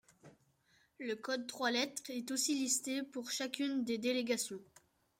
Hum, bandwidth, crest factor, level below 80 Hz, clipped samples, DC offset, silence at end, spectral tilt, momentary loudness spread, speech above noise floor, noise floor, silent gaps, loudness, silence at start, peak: none; 16 kHz; 18 dB; -84 dBFS; under 0.1%; under 0.1%; 0.55 s; -1.5 dB/octave; 8 LU; 35 dB; -73 dBFS; none; -37 LUFS; 0.25 s; -20 dBFS